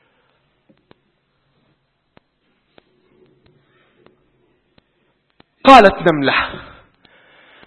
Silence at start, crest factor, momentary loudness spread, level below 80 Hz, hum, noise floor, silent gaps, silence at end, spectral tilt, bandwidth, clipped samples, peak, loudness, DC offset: 5.65 s; 20 dB; 17 LU; -46 dBFS; none; -64 dBFS; none; 1.05 s; -5.5 dB/octave; 11 kHz; 0.3%; 0 dBFS; -11 LUFS; under 0.1%